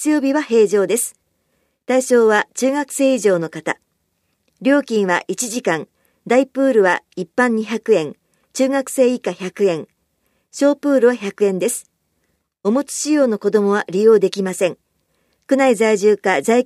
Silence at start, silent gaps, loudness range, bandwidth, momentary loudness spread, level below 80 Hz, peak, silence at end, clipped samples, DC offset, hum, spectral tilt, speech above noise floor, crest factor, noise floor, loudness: 0 s; none; 3 LU; 15 kHz; 10 LU; -72 dBFS; -2 dBFS; 0 s; under 0.1%; under 0.1%; none; -4.5 dB/octave; 52 dB; 16 dB; -68 dBFS; -17 LUFS